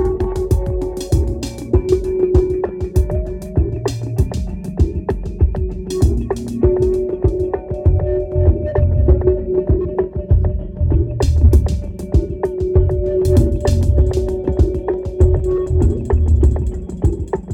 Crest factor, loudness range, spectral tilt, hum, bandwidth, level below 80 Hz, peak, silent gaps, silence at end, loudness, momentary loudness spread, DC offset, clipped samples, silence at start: 14 dB; 3 LU; -8.5 dB/octave; none; 12 kHz; -20 dBFS; -2 dBFS; none; 0 s; -18 LUFS; 8 LU; under 0.1%; under 0.1%; 0 s